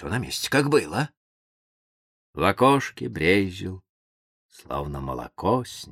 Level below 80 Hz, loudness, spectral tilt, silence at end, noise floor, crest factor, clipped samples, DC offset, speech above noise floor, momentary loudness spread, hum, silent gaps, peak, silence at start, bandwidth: -48 dBFS; -24 LUFS; -5 dB/octave; 0 s; under -90 dBFS; 22 dB; under 0.1%; under 0.1%; over 66 dB; 14 LU; none; 1.17-2.33 s, 3.89-4.49 s; -4 dBFS; 0 s; 16 kHz